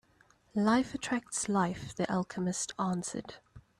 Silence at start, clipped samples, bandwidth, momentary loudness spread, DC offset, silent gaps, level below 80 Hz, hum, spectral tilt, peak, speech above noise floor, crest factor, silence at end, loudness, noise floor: 0.55 s; under 0.1%; 12.5 kHz; 10 LU; under 0.1%; none; -64 dBFS; none; -4.5 dB/octave; -16 dBFS; 34 dB; 18 dB; 0.2 s; -33 LUFS; -66 dBFS